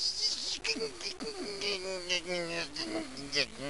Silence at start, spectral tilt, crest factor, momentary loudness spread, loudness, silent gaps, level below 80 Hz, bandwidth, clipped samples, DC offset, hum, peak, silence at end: 0 s; -1.5 dB/octave; 20 dB; 8 LU; -34 LUFS; none; -62 dBFS; 11.5 kHz; under 0.1%; 0.3%; none; -16 dBFS; 0 s